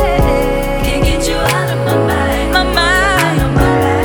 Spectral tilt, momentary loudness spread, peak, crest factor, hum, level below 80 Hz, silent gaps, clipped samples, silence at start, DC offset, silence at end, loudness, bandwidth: -5 dB/octave; 4 LU; 0 dBFS; 12 dB; none; -20 dBFS; none; under 0.1%; 0 s; under 0.1%; 0 s; -13 LUFS; over 20 kHz